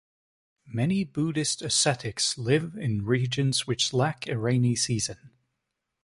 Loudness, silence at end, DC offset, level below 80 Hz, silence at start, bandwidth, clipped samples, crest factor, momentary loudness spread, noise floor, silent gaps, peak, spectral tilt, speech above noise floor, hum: -26 LUFS; 0.75 s; under 0.1%; -58 dBFS; 0.65 s; 11.5 kHz; under 0.1%; 18 dB; 6 LU; -82 dBFS; none; -10 dBFS; -4 dB/octave; 56 dB; none